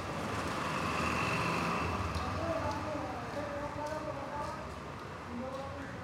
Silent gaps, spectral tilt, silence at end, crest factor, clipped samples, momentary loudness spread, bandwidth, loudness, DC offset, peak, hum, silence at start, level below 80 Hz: none; -5 dB/octave; 0 s; 16 dB; under 0.1%; 10 LU; 16 kHz; -36 LUFS; under 0.1%; -20 dBFS; none; 0 s; -52 dBFS